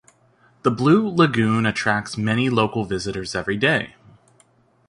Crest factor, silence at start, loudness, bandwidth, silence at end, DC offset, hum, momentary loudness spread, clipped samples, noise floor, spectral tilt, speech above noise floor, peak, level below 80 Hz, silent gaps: 18 dB; 0.65 s; -20 LUFS; 11.5 kHz; 1 s; under 0.1%; none; 9 LU; under 0.1%; -58 dBFS; -6 dB/octave; 39 dB; -4 dBFS; -52 dBFS; none